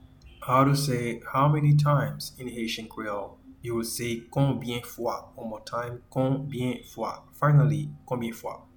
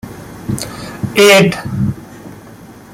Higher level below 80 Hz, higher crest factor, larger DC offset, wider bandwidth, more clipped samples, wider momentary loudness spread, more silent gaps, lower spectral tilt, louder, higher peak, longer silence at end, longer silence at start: second, -56 dBFS vs -42 dBFS; about the same, 18 dB vs 16 dB; neither; first, 19 kHz vs 16.5 kHz; neither; second, 14 LU vs 26 LU; neither; first, -6.5 dB/octave vs -4.5 dB/octave; second, -27 LUFS vs -12 LUFS; second, -8 dBFS vs 0 dBFS; about the same, 0.15 s vs 0.2 s; first, 0.25 s vs 0.05 s